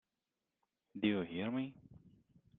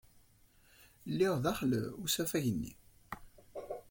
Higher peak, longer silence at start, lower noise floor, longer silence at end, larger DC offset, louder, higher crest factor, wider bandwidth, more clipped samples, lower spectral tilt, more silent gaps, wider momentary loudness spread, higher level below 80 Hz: about the same, -20 dBFS vs -18 dBFS; first, 0.95 s vs 0.8 s; first, under -90 dBFS vs -65 dBFS; first, 0.65 s vs 0.1 s; neither; second, -39 LUFS vs -35 LUFS; about the same, 22 dB vs 18 dB; second, 4.1 kHz vs 17 kHz; neither; about the same, -5 dB/octave vs -5 dB/octave; neither; second, 11 LU vs 18 LU; second, -76 dBFS vs -62 dBFS